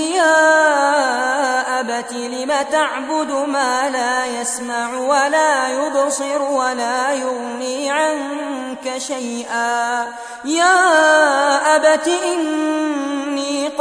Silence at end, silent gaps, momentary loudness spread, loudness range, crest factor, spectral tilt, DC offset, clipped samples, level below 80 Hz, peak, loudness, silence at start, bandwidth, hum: 0 s; none; 11 LU; 6 LU; 16 dB; -0.5 dB/octave; under 0.1%; under 0.1%; -66 dBFS; -2 dBFS; -17 LUFS; 0 s; 11 kHz; none